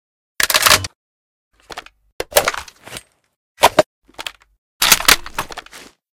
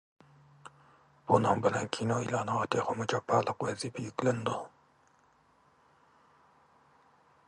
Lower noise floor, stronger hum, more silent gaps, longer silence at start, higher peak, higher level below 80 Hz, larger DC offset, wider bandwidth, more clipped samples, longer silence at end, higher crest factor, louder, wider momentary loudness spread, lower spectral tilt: second, -42 dBFS vs -66 dBFS; neither; first, 0.95-1.51 s, 2.12-2.19 s, 3.36-3.55 s, 3.86-4.02 s, 4.58-4.80 s vs none; second, 0.4 s vs 0.65 s; first, 0 dBFS vs -8 dBFS; first, -42 dBFS vs -68 dBFS; neither; first, over 20 kHz vs 11.5 kHz; first, 0.2% vs under 0.1%; second, 0.35 s vs 2.8 s; second, 20 dB vs 26 dB; first, -14 LUFS vs -31 LUFS; first, 24 LU vs 10 LU; second, -0.5 dB/octave vs -5.5 dB/octave